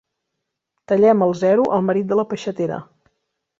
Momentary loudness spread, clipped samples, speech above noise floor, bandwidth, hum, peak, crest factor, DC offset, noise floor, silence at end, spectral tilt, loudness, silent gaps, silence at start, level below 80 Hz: 10 LU; under 0.1%; 61 dB; 7.6 kHz; none; -4 dBFS; 16 dB; under 0.1%; -79 dBFS; 0.75 s; -7.5 dB/octave; -18 LUFS; none; 0.9 s; -62 dBFS